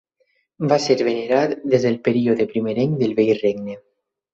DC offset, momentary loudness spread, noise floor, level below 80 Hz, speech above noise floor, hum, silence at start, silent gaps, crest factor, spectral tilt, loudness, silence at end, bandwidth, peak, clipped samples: under 0.1%; 7 LU; -66 dBFS; -62 dBFS; 48 dB; none; 0.6 s; none; 18 dB; -6.5 dB/octave; -19 LUFS; 0.55 s; 8 kHz; -2 dBFS; under 0.1%